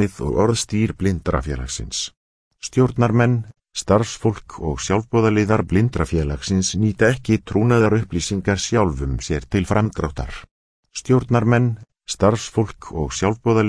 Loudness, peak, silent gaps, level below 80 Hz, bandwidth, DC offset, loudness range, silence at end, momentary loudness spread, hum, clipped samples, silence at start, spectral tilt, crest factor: -20 LUFS; -2 dBFS; 2.17-2.51 s, 10.51-10.83 s; -36 dBFS; 11 kHz; under 0.1%; 3 LU; 0 s; 10 LU; none; under 0.1%; 0 s; -6 dB/octave; 18 dB